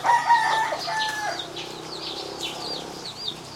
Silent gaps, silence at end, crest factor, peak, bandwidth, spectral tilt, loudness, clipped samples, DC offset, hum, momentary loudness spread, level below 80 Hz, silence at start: none; 0 s; 18 dB; -8 dBFS; 16.5 kHz; -1.5 dB/octave; -26 LUFS; under 0.1%; under 0.1%; none; 14 LU; -60 dBFS; 0 s